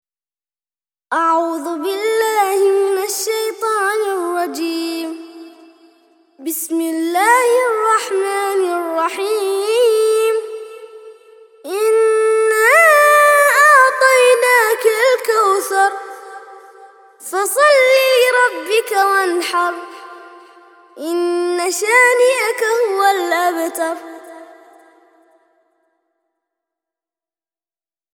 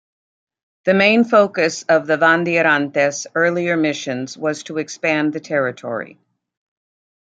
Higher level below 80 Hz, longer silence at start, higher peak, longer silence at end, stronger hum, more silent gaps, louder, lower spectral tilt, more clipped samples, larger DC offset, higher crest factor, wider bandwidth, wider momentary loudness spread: second, -78 dBFS vs -68 dBFS; first, 1.1 s vs 0.85 s; about the same, 0 dBFS vs -2 dBFS; first, 3.7 s vs 1.2 s; neither; neither; first, -14 LUFS vs -17 LUFS; second, 0.5 dB/octave vs -4.5 dB/octave; neither; neither; about the same, 16 dB vs 18 dB; first, 20 kHz vs 9.2 kHz; about the same, 14 LU vs 12 LU